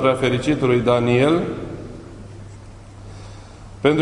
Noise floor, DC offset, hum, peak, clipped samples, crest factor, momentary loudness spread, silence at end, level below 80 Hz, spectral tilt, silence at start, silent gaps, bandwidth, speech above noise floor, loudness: -39 dBFS; under 0.1%; none; -4 dBFS; under 0.1%; 18 dB; 24 LU; 0 s; -44 dBFS; -6.5 dB/octave; 0 s; none; 11 kHz; 22 dB; -19 LUFS